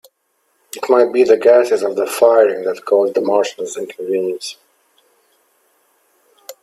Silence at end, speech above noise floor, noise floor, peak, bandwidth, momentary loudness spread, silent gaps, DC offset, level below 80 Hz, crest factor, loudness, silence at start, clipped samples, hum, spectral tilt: 0.1 s; 51 dB; -65 dBFS; 0 dBFS; 14.5 kHz; 14 LU; none; under 0.1%; -68 dBFS; 16 dB; -15 LUFS; 0.75 s; under 0.1%; none; -3.5 dB/octave